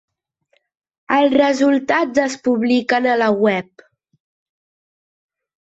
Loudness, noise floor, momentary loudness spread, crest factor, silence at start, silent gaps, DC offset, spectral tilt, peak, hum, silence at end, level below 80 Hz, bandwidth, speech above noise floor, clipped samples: -16 LUFS; -65 dBFS; 4 LU; 16 dB; 1.1 s; none; under 0.1%; -5 dB/octave; -2 dBFS; none; 2.1 s; -62 dBFS; 8 kHz; 49 dB; under 0.1%